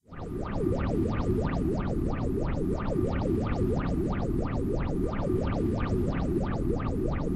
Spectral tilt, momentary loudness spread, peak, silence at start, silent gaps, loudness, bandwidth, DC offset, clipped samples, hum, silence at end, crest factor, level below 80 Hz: -9 dB/octave; 2 LU; -16 dBFS; 0.1 s; none; -30 LUFS; 12.5 kHz; under 0.1%; under 0.1%; none; 0 s; 12 dB; -34 dBFS